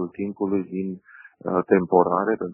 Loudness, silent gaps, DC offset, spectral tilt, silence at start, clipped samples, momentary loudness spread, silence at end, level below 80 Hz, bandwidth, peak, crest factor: -23 LUFS; none; under 0.1%; -10.5 dB/octave; 0 s; under 0.1%; 14 LU; 0 s; -64 dBFS; 2.9 kHz; -4 dBFS; 20 dB